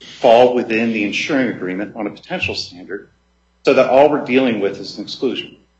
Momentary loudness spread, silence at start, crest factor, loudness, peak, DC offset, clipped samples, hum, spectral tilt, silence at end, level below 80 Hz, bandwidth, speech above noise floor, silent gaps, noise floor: 16 LU; 0 s; 16 dB; -16 LUFS; 0 dBFS; under 0.1%; under 0.1%; none; -5 dB/octave; 0.3 s; -58 dBFS; 8.2 kHz; 27 dB; none; -43 dBFS